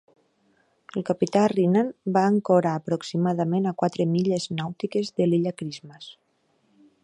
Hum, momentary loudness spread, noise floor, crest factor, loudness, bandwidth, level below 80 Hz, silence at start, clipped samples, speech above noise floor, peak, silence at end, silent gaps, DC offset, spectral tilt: none; 14 LU; -68 dBFS; 18 dB; -24 LUFS; 10.5 kHz; -70 dBFS; 0.95 s; under 0.1%; 44 dB; -6 dBFS; 0.9 s; none; under 0.1%; -7 dB/octave